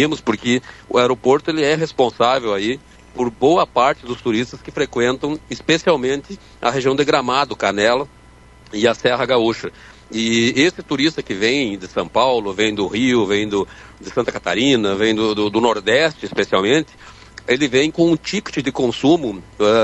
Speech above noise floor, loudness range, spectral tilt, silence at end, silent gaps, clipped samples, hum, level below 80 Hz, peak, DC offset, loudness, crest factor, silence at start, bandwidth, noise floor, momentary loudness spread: 27 dB; 2 LU; -4.5 dB/octave; 0 s; none; under 0.1%; none; -48 dBFS; -2 dBFS; under 0.1%; -18 LUFS; 16 dB; 0 s; 8.4 kHz; -45 dBFS; 9 LU